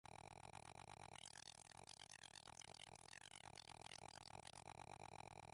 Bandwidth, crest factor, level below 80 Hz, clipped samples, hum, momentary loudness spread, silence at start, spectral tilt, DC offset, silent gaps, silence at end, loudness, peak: 11.5 kHz; 20 dB; -78 dBFS; under 0.1%; none; 2 LU; 0.05 s; -2 dB/octave; under 0.1%; none; 0 s; -59 LUFS; -42 dBFS